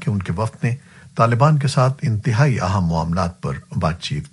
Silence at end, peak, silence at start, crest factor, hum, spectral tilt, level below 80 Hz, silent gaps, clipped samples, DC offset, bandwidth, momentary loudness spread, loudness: 0.05 s; -2 dBFS; 0 s; 18 dB; none; -7 dB/octave; -42 dBFS; none; under 0.1%; under 0.1%; 11.5 kHz; 10 LU; -19 LUFS